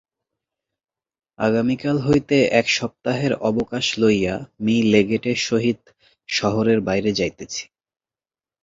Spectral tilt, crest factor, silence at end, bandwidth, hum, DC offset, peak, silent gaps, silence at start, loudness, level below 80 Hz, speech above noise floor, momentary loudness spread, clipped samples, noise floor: -5 dB/octave; 18 dB; 1 s; 7.8 kHz; none; under 0.1%; -2 dBFS; none; 1.4 s; -20 LUFS; -52 dBFS; over 70 dB; 8 LU; under 0.1%; under -90 dBFS